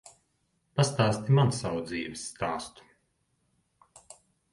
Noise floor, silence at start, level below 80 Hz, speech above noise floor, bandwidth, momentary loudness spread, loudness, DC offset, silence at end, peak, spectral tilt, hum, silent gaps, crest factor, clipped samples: -74 dBFS; 0.05 s; -60 dBFS; 47 dB; 11.5 kHz; 13 LU; -29 LUFS; under 0.1%; 1.85 s; -10 dBFS; -5.5 dB/octave; none; none; 22 dB; under 0.1%